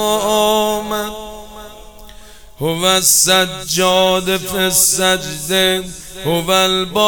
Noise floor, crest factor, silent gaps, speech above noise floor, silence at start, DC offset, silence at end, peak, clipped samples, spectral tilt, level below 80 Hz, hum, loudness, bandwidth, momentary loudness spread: -38 dBFS; 16 dB; none; 24 dB; 0 s; 0.6%; 0 s; 0 dBFS; under 0.1%; -2 dB/octave; -42 dBFS; none; -14 LUFS; over 20 kHz; 15 LU